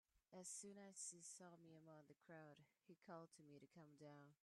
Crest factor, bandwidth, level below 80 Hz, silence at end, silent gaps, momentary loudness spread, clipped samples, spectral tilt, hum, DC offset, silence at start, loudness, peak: 20 dB; 13 kHz; under -90 dBFS; 0.1 s; none; 12 LU; under 0.1%; -3.5 dB/octave; none; under 0.1%; 0.15 s; -61 LUFS; -44 dBFS